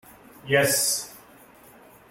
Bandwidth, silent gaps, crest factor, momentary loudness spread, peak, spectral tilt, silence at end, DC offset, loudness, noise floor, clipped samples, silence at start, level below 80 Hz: 17 kHz; none; 20 dB; 21 LU; -8 dBFS; -2 dB/octave; 0.95 s; under 0.1%; -22 LUFS; -51 dBFS; under 0.1%; 0.45 s; -64 dBFS